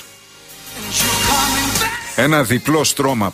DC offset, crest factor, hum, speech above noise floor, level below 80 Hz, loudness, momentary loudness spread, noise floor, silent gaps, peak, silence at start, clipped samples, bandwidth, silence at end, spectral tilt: under 0.1%; 14 dB; none; 26 dB; -38 dBFS; -15 LUFS; 10 LU; -41 dBFS; none; -2 dBFS; 0 s; under 0.1%; 15.5 kHz; 0 s; -3 dB/octave